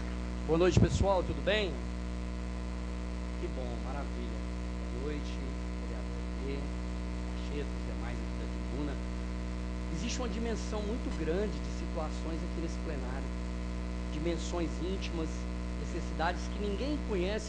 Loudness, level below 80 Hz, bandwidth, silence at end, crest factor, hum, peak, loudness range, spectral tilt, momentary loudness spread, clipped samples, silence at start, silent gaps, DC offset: -36 LUFS; -38 dBFS; 9.8 kHz; 0 s; 22 dB; 60 Hz at -35 dBFS; -12 dBFS; 5 LU; -6 dB/octave; 8 LU; under 0.1%; 0 s; none; under 0.1%